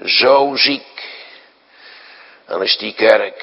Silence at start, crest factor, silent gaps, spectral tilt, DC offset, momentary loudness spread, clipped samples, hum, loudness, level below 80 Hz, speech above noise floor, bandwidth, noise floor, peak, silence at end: 0.05 s; 16 dB; none; -4.5 dB/octave; under 0.1%; 20 LU; under 0.1%; none; -14 LUFS; -68 dBFS; 32 dB; 6.2 kHz; -46 dBFS; 0 dBFS; 0 s